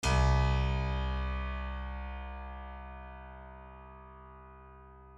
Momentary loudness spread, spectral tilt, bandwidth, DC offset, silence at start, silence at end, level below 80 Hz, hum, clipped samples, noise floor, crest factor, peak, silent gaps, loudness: 24 LU; -5.5 dB/octave; 11 kHz; under 0.1%; 0 s; 0 s; -36 dBFS; none; under 0.1%; -53 dBFS; 16 dB; -18 dBFS; none; -34 LUFS